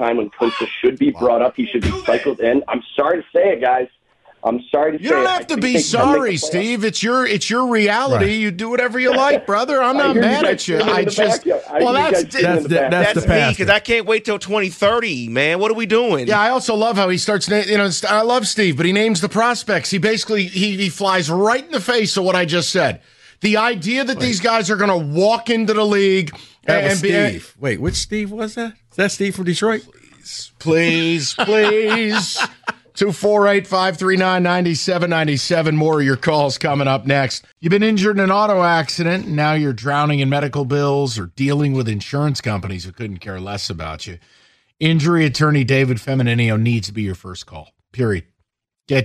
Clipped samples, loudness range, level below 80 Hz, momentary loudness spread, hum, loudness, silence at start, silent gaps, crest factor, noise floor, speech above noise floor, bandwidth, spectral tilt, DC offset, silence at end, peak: under 0.1%; 4 LU; -44 dBFS; 8 LU; none; -17 LUFS; 0 s; none; 18 dB; -71 dBFS; 55 dB; 13 kHz; -5 dB/octave; under 0.1%; 0 s; 0 dBFS